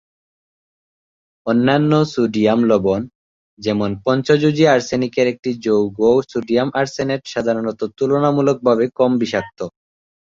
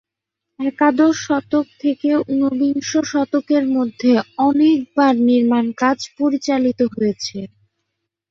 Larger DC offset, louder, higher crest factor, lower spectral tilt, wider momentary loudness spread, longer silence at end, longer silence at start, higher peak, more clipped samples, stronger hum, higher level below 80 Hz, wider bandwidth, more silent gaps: neither; about the same, -17 LUFS vs -17 LUFS; about the same, 16 dB vs 14 dB; first, -6.5 dB/octave vs -5 dB/octave; about the same, 9 LU vs 7 LU; second, 0.6 s vs 0.85 s; first, 1.45 s vs 0.6 s; about the same, -2 dBFS vs -2 dBFS; neither; neither; first, -54 dBFS vs -62 dBFS; about the same, 7.6 kHz vs 7.6 kHz; first, 3.15-3.57 s vs none